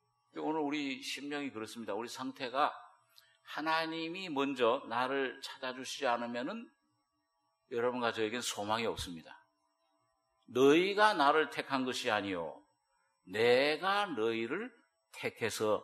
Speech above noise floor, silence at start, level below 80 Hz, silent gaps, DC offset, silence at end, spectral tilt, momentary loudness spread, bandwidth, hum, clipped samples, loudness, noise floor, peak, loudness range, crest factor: 47 dB; 0.35 s; -70 dBFS; none; under 0.1%; 0 s; -3.5 dB/octave; 14 LU; 13 kHz; none; under 0.1%; -34 LUFS; -81 dBFS; -12 dBFS; 7 LU; 22 dB